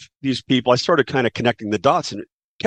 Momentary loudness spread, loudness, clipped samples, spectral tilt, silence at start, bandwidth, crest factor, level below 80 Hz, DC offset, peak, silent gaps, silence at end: 8 LU; -19 LUFS; under 0.1%; -5 dB/octave; 0 s; 9.8 kHz; 18 dB; -58 dBFS; under 0.1%; -2 dBFS; 2.32-2.59 s; 0 s